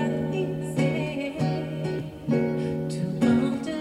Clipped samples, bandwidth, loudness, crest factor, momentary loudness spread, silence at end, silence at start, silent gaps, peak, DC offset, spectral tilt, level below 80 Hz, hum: under 0.1%; 12.5 kHz; -27 LUFS; 16 dB; 7 LU; 0 s; 0 s; none; -10 dBFS; under 0.1%; -7.5 dB/octave; -54 dBFS; none